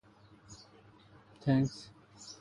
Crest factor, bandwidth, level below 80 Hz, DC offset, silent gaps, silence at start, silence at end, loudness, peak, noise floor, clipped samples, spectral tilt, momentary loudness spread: 22 dB; 11 kHz; -64 dBFS; under 0.1%; none; 0.5 s; 0.05 s; -33 LUFS; -16 dBFS; -60 dBFS; under 0.1%; -7 dB/octave; 24 LU